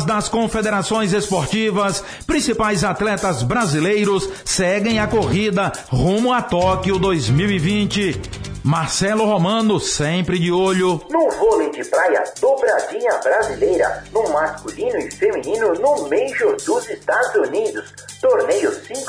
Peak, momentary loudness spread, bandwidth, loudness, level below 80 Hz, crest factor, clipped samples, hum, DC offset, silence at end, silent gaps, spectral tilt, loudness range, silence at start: -6 dBFS; 5 LU; 11 kHz; -18 LUFS; -40 dBFS; 12 dB; under 0.1%; none; under 0.1%; 0 s; none; -5 dB/octave; 2 LU; 0 s